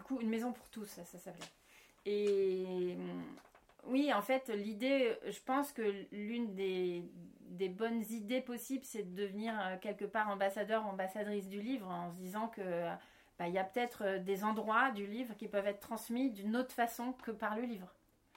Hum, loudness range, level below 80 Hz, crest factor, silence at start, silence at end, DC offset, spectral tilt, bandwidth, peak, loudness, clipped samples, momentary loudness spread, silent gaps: none; 4 LU; -78 dBFS; 20 dB; 0 s; 0.45 s; under 0.1%; -5 dB/octave; 16.5 kHz; -18 dBFS; -39 LUFS; under 0.1%; 15 LU; none